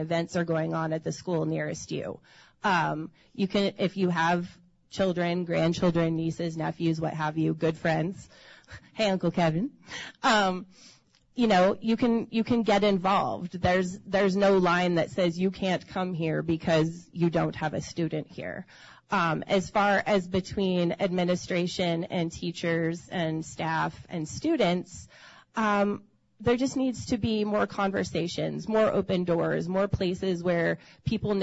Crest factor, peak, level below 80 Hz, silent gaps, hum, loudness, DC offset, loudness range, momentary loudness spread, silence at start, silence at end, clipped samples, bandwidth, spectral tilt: 16 dB; -12 dBFS; -56 dBFS; none; none; -27 LUFS; under 0.1%; 4 LU; 9 LU; 0 s; 0 s; under 0.1%; 8 kHz; -6 dB/octave